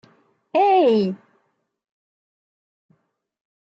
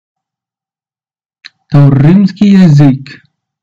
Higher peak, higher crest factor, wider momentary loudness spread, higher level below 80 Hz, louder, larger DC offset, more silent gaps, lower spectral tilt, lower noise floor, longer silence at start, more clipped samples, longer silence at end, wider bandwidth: second, -8 dBFS vs 0 dBFS; first, 16 dB vs 10 dB; first, 12 LU vs 6 LU; second, -78 dBFS vs -40 dBFS; second, -18 LUFS vs -6 LUFS; neither; neither; about the same, -8 dB/octave vs -9 dB/octave; second, -70 dBFS vs under -90 dBFS; second, 0.55 s vs 1.7 s; second, under 0.1% vs 3%; first, 2.45 s vs 0.5 s; about the same, 7.6 kHz vs 7.2 kHz